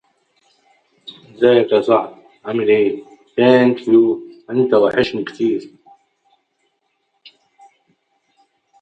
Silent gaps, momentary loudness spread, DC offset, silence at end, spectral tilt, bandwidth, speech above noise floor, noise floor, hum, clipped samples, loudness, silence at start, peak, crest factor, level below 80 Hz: none; 19 LU; under 0.1%; 3.15 s; -7.5 dB/octave; 8 kHz; 54 dB; -68 dBFS; none; under 0.1%; -16 LUFS; 1.1 s; 0 dBFS; 18 dB; -60 dBFS